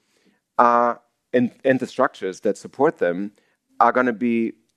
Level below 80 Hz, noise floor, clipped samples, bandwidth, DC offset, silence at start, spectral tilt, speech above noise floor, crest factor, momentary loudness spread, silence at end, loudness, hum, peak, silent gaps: -76 dBFS; -64 dBFS; under 0.1%; 10.5 kHz; under 0.1%; 0.6 s; -6.5 dB/octave; 44 dB; 20 dB; 9 LU; 0.25 s; -21 LUFS; none; 0 dBFS; none